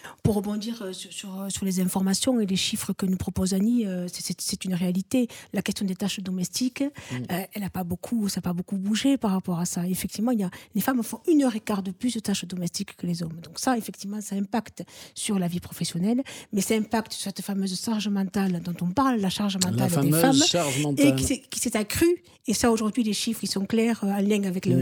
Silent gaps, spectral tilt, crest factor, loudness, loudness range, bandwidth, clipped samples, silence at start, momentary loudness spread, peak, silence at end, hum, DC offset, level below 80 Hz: none; -4.5 dB/octave; 22 dB; -26 LUFS; 6 LU; over 20 kHz; under 0.1%; 0.05 s; 9 LU; -4 dBFS; 0 s; none; under 0.1%; -54 dBFS